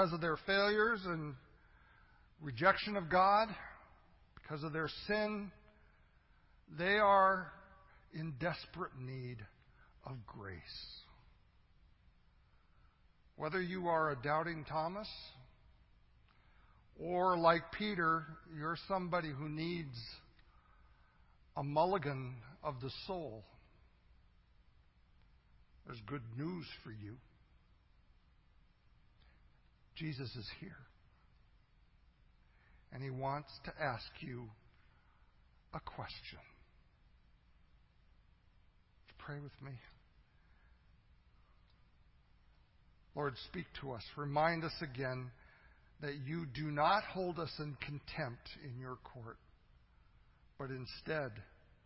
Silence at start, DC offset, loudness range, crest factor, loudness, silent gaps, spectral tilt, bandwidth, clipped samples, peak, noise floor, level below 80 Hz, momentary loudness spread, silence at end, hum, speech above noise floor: 0 s; under 0.1%; 19 LU; 28 dB; -38 LUFS; none; -3.5 dB/octave; 5.6 kHz; under 0.1%; -14 dBFS; -68 dBFS; -66 dBFS; 21 LU; 0.4 s; none; 30 dB